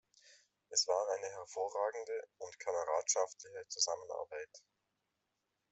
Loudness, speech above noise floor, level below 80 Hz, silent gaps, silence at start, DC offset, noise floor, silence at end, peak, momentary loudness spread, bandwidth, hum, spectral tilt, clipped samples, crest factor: -38 LUFS; 47 dB; -88 dBFS; none; 0.25 s; under 0.1%; -86 dBFS; 1.15 s; -20 dBFS; 13 LU; 8.2 kHz; none; 1.5 dB/octave; under 0.1%; 20 dB